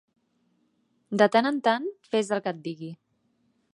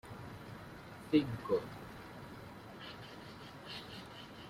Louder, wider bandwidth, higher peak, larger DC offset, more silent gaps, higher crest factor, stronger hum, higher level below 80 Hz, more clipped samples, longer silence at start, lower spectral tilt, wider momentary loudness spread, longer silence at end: first, -25 LUFS vs -42 LUFS; second, 11.5 kHz vs 16 kHz; first, -6 dBFS vs -18 dBFS; neither; neither; about the same, 22 dB vs 24 dB; neither; second, -80 dBFS vs -66 dBFS; neither; first, 1.1 s vs 0.05 s; second, -5 dB/octave vs -6.5 dB/octave; about the same, 16 LU vs 17 LU; first, 0.8 s vs 0 s